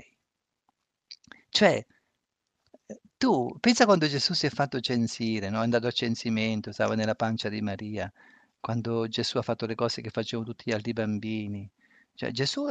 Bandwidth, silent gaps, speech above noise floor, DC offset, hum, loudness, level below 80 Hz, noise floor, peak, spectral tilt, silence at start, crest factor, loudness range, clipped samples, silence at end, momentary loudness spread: 9.2 kHz; none; 56 dB; under 0.1%; none; -28 LUFS; -66 dBFS; -83 dBFS; -6 dBFS; -5 dB/octave; 1.1 s; 22 dB; 6 LU; under 0.1%; 0 s; 14 LU